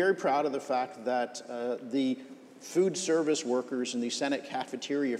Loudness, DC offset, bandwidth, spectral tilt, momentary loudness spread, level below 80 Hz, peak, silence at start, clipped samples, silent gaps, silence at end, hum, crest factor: -31 LUFS; under 0.1%; 13.5 kHz; -4 dB/octave; 9 LU; -88 dBFS; -16 dBFS; 0 s; under 0.1%; none; 0 s; none; 16 dB